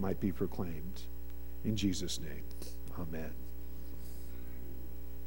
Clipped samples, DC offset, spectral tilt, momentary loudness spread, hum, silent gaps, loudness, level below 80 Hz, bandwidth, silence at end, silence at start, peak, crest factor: under 0.1%; 1%; -5.5 dB/octave; 14 LU; none; none; -41 LUFS; -48 dBFS; 18 kHz; 0 s; 0 s; -20 dBFS; 20 dB